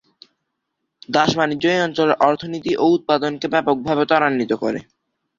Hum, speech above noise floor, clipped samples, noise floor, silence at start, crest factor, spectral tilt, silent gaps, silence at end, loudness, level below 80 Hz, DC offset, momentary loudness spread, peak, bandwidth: none; 58 dB; under 0.1%; -76 dBFS; 1.1 s; 18 dB; -5.5 dB/octave; none; 0.55 s; -18 LUFS; -58 dBFS; under 0.1%; 6 LU; -2 dBFS; 7.6 kHz